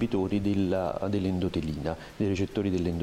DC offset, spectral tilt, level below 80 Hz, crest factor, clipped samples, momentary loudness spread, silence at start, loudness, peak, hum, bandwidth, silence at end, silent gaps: under 0.1%; -7.5 dB/octave; -48 dBFS; 12 dB; under 0.1%; 5 LU; 0 s; -29 LUFS; -16 dBFS; none; 14 kHz; 0 s; none